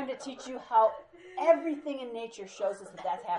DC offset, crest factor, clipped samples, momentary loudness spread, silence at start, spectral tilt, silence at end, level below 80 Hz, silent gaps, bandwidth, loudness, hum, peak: under 0.1%; 20 dB; under 0.1%; 16 LU; 0 s; -4 dB/octave; 0 s; -76 dBFS; none; 10.5 kHz; -31 LUFS; none; -12 dBFS